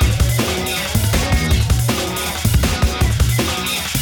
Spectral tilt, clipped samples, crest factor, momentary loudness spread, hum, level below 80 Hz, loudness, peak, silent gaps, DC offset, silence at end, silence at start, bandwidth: -4 dB/octave; under 0.1%; 16 dB; 3 LU; none; -22 dBFS; -17 LUFS; -2 dBFS; none; under 0.1%; 0 s; 0 s; over 20 kHz